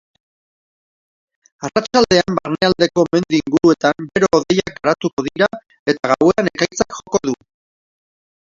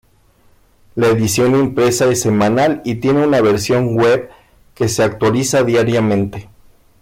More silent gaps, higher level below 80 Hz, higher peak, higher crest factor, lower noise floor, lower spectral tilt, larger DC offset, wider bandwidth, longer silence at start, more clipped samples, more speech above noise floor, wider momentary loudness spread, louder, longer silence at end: first, 5.13-5.17 s, 5.79-5.86 s vs none; about the same, -50 dBFS vs -46 dBFS; first, 0 dBFS vs -6 dBFS; first, 18 dB vs 10 dB; first, under -90 dBFS vs -52 dBFS; about the same, -4.5 dB/octave vs -5.5 dB/octave; neither; second, 7.6 kHz vs 16.5 kHz; first, 1.6 s vs 0.95 s; neither; first, over 74 dB vs 38 dB; about the same, 7 LU vs 6 LU; second, -17 LUFS vs -14 LUFS; first, 1.2 s vs 0.6 s